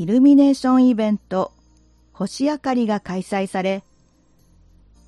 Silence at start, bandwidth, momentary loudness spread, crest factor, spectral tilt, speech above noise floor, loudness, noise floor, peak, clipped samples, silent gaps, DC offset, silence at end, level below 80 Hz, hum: 0 s; 11 kHz; 14 LU; 14 dB; -6.5 dB/octave; 39 dB; -19 LUFS; -57 dBFS; -6 dBFS; under 0.1%; none; under 0.1%; 1.25 s; -56 dBFS; none